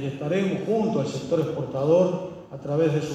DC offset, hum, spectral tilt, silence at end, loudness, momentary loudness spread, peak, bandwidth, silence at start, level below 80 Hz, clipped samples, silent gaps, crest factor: under 0.1%; none; -7.5 dB/octave; 0 s; -24 LUFS; 9 LU; -10 dBFS; 9.4 kHz; 0 s; -62 dBFS; under 0.1%; none; 16 dB